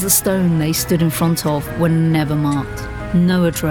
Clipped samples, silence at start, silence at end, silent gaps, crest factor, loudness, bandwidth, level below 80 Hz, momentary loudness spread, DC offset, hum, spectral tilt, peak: under 0.1%; 0 s; 0 s; none; 14 dB; -17 LUFS; over 20 kHz; -36 dBFS; 6 LU; 0.1%; none; -5 dB/octave; -2 dBFS